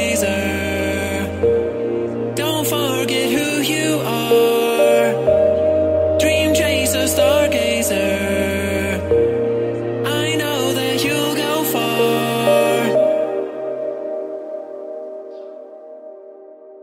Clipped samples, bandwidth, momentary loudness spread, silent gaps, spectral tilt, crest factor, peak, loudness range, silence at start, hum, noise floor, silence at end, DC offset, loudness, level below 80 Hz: under 0.1%; 16 kHz; 15 LU; none; -4 dB/octave; 14 dB; -2 dBFS; 5 LU; 0 s; none; -40 dBFS; 0 s; under 0.1%; -17 LUFS; -44 dBFS